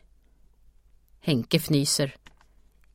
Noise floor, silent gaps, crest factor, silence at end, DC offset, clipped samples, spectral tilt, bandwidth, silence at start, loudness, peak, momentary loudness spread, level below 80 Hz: -58 dBFS; none; 24 dB; 0.8 s; under 0.1%; under 0.1%; -4.5 dB/octave; 16.5 kHz; 1.25 s; -25 LUFS; -4 dBFS; 8 LU; -56 dBFS